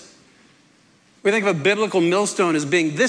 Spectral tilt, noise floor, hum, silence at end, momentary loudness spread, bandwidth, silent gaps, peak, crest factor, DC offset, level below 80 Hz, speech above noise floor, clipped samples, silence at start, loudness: -4.5 dB/octave; -56 dBFS; none; 0 s; 2 LU; 11 kHz; none; -6 dBFS; 14 dB; under 0.1%; -72 dBFS; 37 dB; under 0.1%; 0 s; -19 LUFS